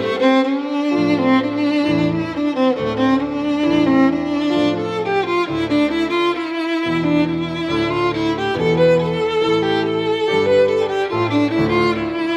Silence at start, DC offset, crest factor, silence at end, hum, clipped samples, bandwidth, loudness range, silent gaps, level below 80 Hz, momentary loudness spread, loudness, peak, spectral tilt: 0 s; under 0.1%; 14 dB; 0 s; none; under 0.1%; 9.8 kHz; 2 LU; none; -48 dBFS; 5 LU; -17 LUFS; -4 dBFS; -6.5 dB/octave